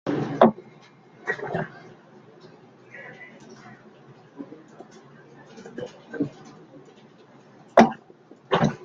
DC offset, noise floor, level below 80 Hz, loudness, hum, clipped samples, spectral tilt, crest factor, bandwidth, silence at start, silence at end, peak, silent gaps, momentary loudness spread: under 0.1%; -52 dBFS; -64 dBFS; -24 LUFS; none; under 0.1%; -6.5 dB/octave; 26 dB; 7.4 kHz; 0.05 s; 0 s; -2 dBFS; none; 28 LU